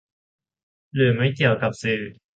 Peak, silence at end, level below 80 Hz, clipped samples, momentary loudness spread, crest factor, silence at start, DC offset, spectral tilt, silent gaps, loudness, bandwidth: -6 dBFS; 0.25 s; -58 dBFS; under 0.1%; 7 LU; 18 dB; 0.95 s; under 0.1%; -6.5 dB/octave; none; -22 LUFS; 9 kHz